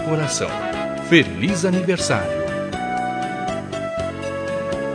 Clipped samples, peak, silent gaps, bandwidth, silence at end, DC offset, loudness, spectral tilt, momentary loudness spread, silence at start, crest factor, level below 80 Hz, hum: under 0.1%; 0 dBFS; none; 10.5 kHz; 0 s; under 0.1%; -21 LUFS; -4.5 dB/octave; 10 LU; 0 s; 22 dB; -48 dBFS; none